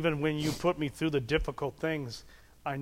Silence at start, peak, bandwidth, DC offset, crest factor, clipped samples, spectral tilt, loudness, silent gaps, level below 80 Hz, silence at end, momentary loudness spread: 0 s; -14 dBFS; 16 kHz; under 0.1%; 18 dB; under 0.1%; -6 dB/octave; -32 LUFS; none; -48 dBFS; 0 s; 11 LU